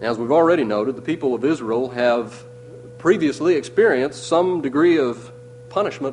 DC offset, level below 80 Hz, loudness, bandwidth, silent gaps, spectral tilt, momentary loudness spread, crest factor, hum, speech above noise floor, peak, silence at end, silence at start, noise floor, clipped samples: under 0.1%; -60 dBFS; -19 LUFS; 10.5 kHz; none; -6 dB/octave; 10 LU; 16 dB; none; 20 dB; -4 dBFS; 0 s; 0 s; -39 dBFS; under 0.1%